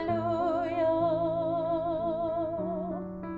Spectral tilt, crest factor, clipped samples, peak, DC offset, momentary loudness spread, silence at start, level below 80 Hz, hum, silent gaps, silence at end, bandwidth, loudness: -9.5 dB/octave; 12 dB; under 0.1%; -18 dBFS; under 0.1%; 6 LU; 0 s; -54 dBFS; none; none; 0 s; 4.9 kHz; -30 LUFS